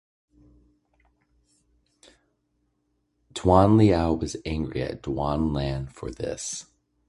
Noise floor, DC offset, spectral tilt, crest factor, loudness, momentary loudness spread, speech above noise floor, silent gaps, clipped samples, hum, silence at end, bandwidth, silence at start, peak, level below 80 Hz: -73 dBFS; under 0.1%; -6.5 dB/octave; 24 dB; -24 LUFS; 15 LU; 50 dB; none; under 0.1%; 60 Hz at -55 dBFS; 0.45 s; 11.5 kHz; 3.35 s; -4 dBFS; -40 dBFS